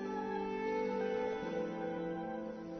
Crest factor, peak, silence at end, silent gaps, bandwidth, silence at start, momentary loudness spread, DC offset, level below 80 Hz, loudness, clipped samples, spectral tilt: 12 dB; -26 dBFS; 0 s; none; 6.4 kHz; 0 s; 5 LU; under 0.1%; -66 dBFS; -39 LUFS; under 0.1%; -5 dB/octave